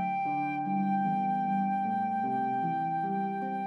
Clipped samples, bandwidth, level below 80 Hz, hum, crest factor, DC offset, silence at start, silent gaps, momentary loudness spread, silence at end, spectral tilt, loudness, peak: under 0.1%; 5.8 kHz; -82 dBFS; none; 10 dB; under 0.1%; 0 s; none; 3 LU; 0 s; -9 dB/octave; -30 LUFS; -20 dBFS